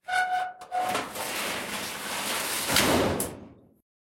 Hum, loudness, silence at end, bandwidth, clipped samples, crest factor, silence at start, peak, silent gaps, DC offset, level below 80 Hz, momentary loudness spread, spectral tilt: none; -28 LUFS; 0.45 s; 16.5 kHz; under 0.1%; 24 dB; 0.05 s; -6 dBFS; none; under 0.1%; -54 dBFS; 10 LU; -2.5 dB/octave